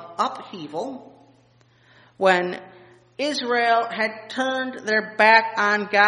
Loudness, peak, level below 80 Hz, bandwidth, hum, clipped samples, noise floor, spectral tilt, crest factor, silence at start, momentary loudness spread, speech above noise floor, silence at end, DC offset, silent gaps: -21 LUFS; 0 dBFS; -74 dBFS; 10.5 kHz; none; under 0.1%; -57 dBFS; -3.5 dB/octave; 22 dB; 0 s; 17 LU; 36 dB; 0 s; under 0.1%; none